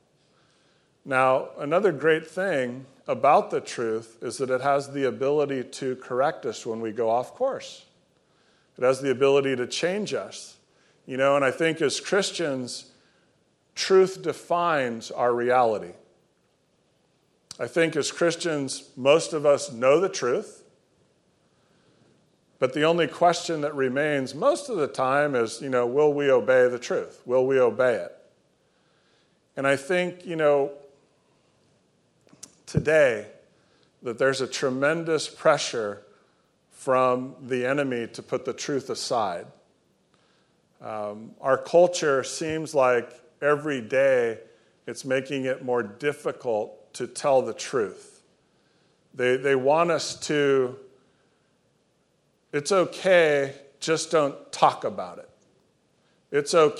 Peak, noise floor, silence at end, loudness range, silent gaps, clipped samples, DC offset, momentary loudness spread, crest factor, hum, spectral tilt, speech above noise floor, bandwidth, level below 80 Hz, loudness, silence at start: -2 dBFS; -68 dBFS; 0 s; 5 LU; none; under 0.1%; under 0.1%; 12 LU; 22 dB; none; -4.5 dB/octave; 44 dB; 12 kHz; -66 dBFS; -24 LUFS; 1.05 s